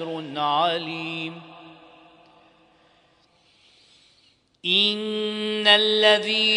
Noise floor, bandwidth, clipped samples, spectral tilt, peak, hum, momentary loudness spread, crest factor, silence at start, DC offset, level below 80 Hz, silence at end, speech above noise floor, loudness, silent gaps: -61 dBFS; 10.5 kHz; under 0.1%; -3.5 dB/octave; -2 dBFS; none; 15 LU; 22 dB; 0 s; under 0.1%; -76 dBFS; 0 s; 39 dB; -20 LUFS; none